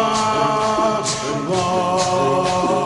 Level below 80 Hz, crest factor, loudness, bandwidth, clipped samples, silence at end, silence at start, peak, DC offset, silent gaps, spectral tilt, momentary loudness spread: -48 dBFS; 12 dB; -18 LUFS; 11.5 kHz; under 0.1%; 0 s; 0 s; -6 dBFS; under 0.1%; none; -4 dB/octave; 3 LU